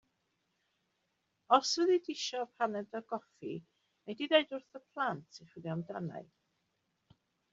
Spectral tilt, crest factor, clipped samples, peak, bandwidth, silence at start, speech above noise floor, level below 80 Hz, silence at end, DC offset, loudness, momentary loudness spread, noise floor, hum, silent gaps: -3 dB/octave; 26 dB; under 0.1%; -12 dBFS; 7.6 kHz; 1.5 s; 47 dB; -82 dBFS; 1.3 s; under 0.1%; -34 LUFS; 17 LU; -81 dBFS; none; none